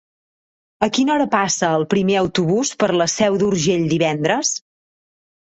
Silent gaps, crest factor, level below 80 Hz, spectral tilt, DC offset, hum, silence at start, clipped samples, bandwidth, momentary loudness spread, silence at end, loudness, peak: none; 18 dB; -54 dBFS; -4 dB/octave; under 0.1%; none; 0.8 s; under 0.1%; 8.4 kHz; 3 LU; 0.9 s; -18 LUFS; -2 dBFS